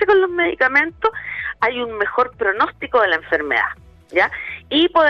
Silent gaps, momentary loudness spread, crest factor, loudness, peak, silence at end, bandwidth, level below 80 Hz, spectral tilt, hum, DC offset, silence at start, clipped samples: none; 8 LU; 14 dB; -18 LUFS; -6 dBFS; 0 s; 6.6 kHz; -50 dBFS; -5 dB/octave; none; under 0.1%; 0 s; under 0.1%